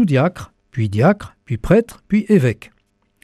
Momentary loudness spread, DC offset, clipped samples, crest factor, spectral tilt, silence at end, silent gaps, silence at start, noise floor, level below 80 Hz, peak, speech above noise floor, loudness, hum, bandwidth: 13 LU; under 0.1%; under 0.1%; 16 dB; -8 dB/octave; 0.7 s; none; 0 s; -63 dBFS; -40 dBFS; -2 dBFS; 46 dB; -17 LUFS; none; 13.5 kHz